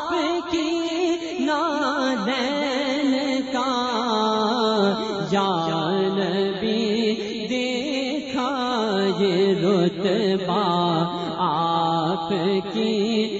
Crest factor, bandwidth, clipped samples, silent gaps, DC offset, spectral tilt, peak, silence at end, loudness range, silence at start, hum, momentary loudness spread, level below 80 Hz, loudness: 14 dB; 8 kHz; under 0.1%; none; under 0.1%; -5.5 dB/octave; -8 dBFS; 0 s; 2 LU; 0 s; none; 4 LU; -60 dBFS; -22 LUFS